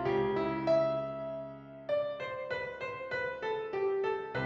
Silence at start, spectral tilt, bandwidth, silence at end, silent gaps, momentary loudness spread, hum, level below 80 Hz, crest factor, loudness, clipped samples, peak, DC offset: 0 s; -7 dB/octave; 7.2 kHz; 0 s; none; 10 LU; none; -64 dBFS; 14 dB; -34 LUFS; under 0.1%; -18 dBFS; under 0.1%